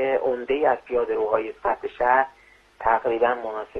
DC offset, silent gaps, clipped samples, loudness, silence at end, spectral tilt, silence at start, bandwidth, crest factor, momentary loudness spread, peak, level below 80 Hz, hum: under 0.1%; none; under 0.1%; -23 LUFS; 0 s; -6.5 dB/octave; 0 s; 6.2 kHz; 18 dB; 6 LU; -6 dBFS; -54 dBFS; none